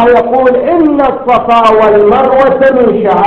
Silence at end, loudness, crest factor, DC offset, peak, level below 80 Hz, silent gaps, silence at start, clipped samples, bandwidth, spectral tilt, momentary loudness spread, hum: 0 s; -7 LUFS; 6 dB; under 0.1%; 0 dBFS; -36 dBFS; none; 0 s; 1%; 7.4 kHz; -7 dB/octave; 3 LU; none